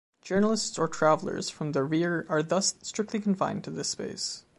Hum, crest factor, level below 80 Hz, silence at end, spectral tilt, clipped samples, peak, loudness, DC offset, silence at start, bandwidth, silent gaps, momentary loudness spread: none; 20 dB; -68 dBFS; 0.2 s; -4 dB/octave; under 0.1%; -8 dBFS; -28 LUFS; under 0.1%; 0.25 s; 11.5 kHz; none; 8 LU